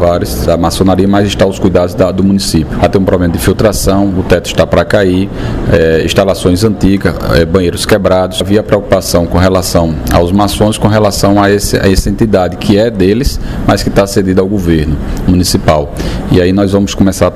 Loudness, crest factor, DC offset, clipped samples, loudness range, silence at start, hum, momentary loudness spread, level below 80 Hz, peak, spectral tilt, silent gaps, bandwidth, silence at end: -10 LUFS; 8 dB; 0.6%; 0.5%; 1 LU; 0 s; none; 3 LU; -22 dBFS; 0 dBFS; -5.5 dB/octave; none; 16 kHz; 0 s